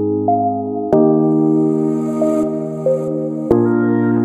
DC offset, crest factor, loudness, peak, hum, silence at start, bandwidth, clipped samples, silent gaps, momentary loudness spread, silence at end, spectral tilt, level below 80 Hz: under 0.1%; 14 dB; -16 LUFS; 0 dBFS; none; 0 s; 9 kHz; under 0.1%; none; 7 LU; 0 s; -10 dB/octave; -50 dBFS